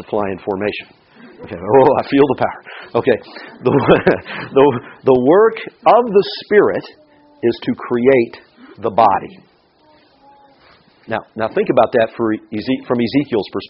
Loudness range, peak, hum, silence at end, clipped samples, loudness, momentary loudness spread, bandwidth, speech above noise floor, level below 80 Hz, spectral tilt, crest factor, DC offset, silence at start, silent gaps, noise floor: 6 LU; 0 dBFS; none; 0.05 s; under 0.1%; -15 LUFS; 12 LU; 5.6 kHz; 37 dB; -50 dBFS; -5 dB/octave; 16 dB; under 0.1%; 0 s; none; -52 dBFS